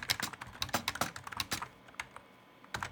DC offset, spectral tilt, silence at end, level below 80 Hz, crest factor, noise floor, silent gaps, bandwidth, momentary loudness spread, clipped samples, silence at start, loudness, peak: under 0.1%; -2 dB/octave; 0 s; -62 dBFS; 28 dB; -59 dBFS; none; over 20 kHz; 13 LU; under 0.1%; 0 s; -38 LUFS; -12 dBFS